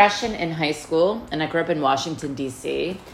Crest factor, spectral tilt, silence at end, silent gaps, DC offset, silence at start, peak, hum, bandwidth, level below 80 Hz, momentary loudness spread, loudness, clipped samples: 22 dB; -4.5 dB/octave; 0 s; none; under 0.1%; 0 s; -2 dBFS; none; 15 kHz; -52 dBFS; 7 LU; -23 LUFS; under 0.1%